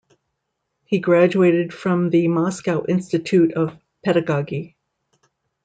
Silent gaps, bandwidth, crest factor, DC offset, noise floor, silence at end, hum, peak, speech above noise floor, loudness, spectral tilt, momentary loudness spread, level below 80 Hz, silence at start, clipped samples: none; 9.2 kHz; 16 dB; under 0.1%; -76 dBFS; 0.95 s; none; -4 dBFS; 58 dB; -19 LUFS; -7.5 dB/octave; 10 LU; -64 dBFS; 0.9 s; under 0.1%